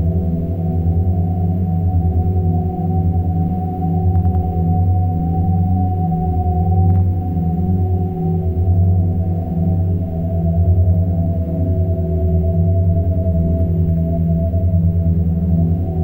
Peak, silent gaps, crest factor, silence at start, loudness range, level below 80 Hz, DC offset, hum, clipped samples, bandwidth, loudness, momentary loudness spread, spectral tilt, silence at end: -4 dBFS; none; 12 dB; 0 s; 1 LU; -28 dBFS; under 0.1%; none; under 0.1%; 1.4 kHz; -17 LUFS; 4 LU; -13 dB/octave; 0 s